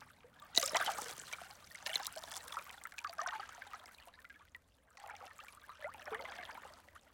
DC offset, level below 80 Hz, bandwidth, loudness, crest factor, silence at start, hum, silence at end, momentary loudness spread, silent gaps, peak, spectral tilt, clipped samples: under 0.1%; -76 dBFS; 17 kHz; -41 LUFS; 34 dB; 0 s; none; 0 s; 24 LU; none; -12 dBFS; 1 dB/octave; under 0.1%